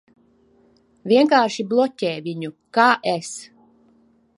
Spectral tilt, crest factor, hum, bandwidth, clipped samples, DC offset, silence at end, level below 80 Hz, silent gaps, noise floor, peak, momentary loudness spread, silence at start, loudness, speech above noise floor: -4.5 dB/octave; 20 dB; none; 11.5 kHz; under 0.1%; under 0.1%; 0.9 s; -74 dBFS; none; -58 dBFS; 0 dBFS; 17 LU; 1.05 s; -19 LUFS; 39 dB